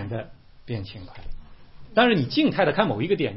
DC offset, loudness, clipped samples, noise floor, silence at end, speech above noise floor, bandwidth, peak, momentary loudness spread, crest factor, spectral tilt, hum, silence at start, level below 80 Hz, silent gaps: 0.3%; -23 LUFS; under 0.1%; -44 dBFS; 0 s; 21 dB; 5.8 kHz; -6 dBFS; 21 LU; 20 dB; -9.5 dB/octave; none; 0 s; -44 dBFS; none